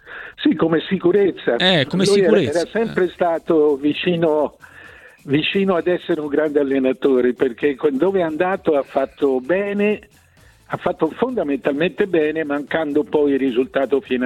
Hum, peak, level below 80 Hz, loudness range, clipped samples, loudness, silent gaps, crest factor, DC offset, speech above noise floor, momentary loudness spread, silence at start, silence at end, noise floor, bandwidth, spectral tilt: none; -2 dBFS; -56 dBFS; 4 LU; under 0.1%; -18 LUFS; none; 16 dB; under 0.1%; 33 dB; 6 LU; 0.05 s; 0 s; -51 dBFS; 12 kHz; -6 dB/octave